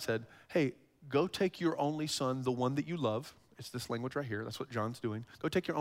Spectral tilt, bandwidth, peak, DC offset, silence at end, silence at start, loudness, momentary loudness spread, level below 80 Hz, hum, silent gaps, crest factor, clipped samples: -5.5 dB/octave; 16 kHz; -18 dBFS; under 0.1%; 0 s; 0 s; -36 LUFS; 7 LU; -70 dBFS; none; none; 16 dB; under 0.1%